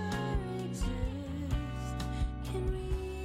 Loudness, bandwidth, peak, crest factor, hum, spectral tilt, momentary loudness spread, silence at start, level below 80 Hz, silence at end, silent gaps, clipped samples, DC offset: -37 LUFS; 15 kHz; -22 dBFS; 12 dB; none; -6.5 dB/octave; 3 LU; 0 s; -38 dBFS; 0 s; none; under 0.1%; under 0.1%